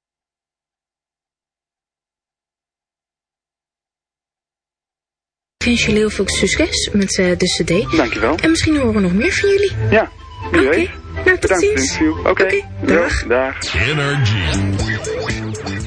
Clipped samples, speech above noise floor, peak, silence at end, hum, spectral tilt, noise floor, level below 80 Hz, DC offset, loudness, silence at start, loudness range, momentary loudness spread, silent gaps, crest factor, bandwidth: under 0.1%; over 75 dB; 0 dBFS; 0 s; none; -4.5 dB/octave; under -90 dBFS; -34 dBFS; under 0.1%; -16 LUFS; 5.6 s; 4 LU; 6 LU; none; 18 dB; 10.5 kHz